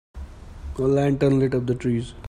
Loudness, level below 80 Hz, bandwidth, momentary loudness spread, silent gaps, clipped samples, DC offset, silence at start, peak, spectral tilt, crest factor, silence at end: -22 LUFS; -40 dBFS; 10.5 kHz; 21 LU; none; under 0.1%; under 0.1%; 0.15 s; -8 dBFS; -8.5 dB/octave; 14 dB; 0 s